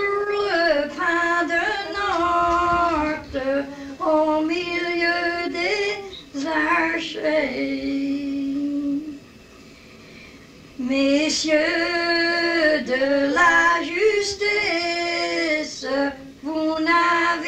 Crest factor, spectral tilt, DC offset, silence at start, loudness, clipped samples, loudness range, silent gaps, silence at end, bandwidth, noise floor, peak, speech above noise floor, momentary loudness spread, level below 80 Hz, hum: 16 dB; -3 dB/octave; under 0.1%; 0 s; -21 LUFS; under 0.1%; 7 LU; none; 0 s; 11 kHz; -45 dBFS; -6 dBFS; 25 dB; 7 LU; -50 dBFS; none